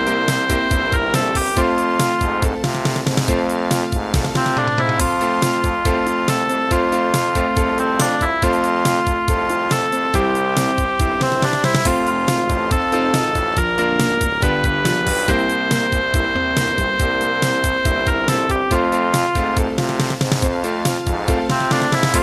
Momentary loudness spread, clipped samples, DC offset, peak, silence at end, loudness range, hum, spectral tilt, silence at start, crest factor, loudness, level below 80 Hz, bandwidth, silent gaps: 2 LU; under 0.1%; under 0.1%; -4 dBFS; 0 s; 1 LU; none; -5 dB/octave; 0 s; 14 dB; -18 LUFS; -28 dBFS; 14 kHz; none